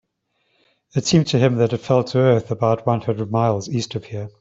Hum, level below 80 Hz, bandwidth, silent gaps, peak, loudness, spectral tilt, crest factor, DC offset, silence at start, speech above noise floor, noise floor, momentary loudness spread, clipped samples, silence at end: none; -54 dBFS; 8 kHz; none; -2 dBFS; -19 LUFS; -6 dB/octave; 16 dB; under 0.1%; 0.95 s; 51 dB; -70 dBFS; 9 LU; under 0.1%; 0.1 s